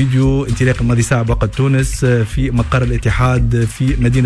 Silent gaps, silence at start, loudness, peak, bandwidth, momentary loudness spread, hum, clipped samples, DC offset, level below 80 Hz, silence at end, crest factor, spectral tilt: none; 0 s; -15 LUFS; -4 dBFS; 11 kHz; 3 LU; none; under 0.1%; under 0.1%; -22 dBFS; 0 s; 10 dB; -6.5 dB/octave